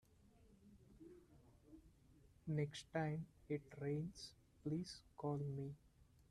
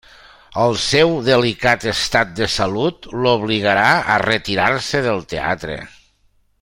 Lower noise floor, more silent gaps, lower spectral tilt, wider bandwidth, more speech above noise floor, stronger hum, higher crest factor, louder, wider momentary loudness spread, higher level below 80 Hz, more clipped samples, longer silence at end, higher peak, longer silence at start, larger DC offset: first, -70 dBFS vs -59 dBFS; neither; first, -7 dB/octave vs -4 dB/octave; second, 12 kHz vs 16.5 kHz; second, 24 dB vs 42 dB; neither; about the same, 18 dB vs 18 dB; second, -47 LUFS vs -17 LUFS; first, 22 LU vs 8 LU; second, -74 dBFS vs -44 dBFS; neither; second, 0.3 s vs 0.75 s; second, -30 dBFS vs 0 dBFS; about the same, 0.4 s vs 0.5 s; neither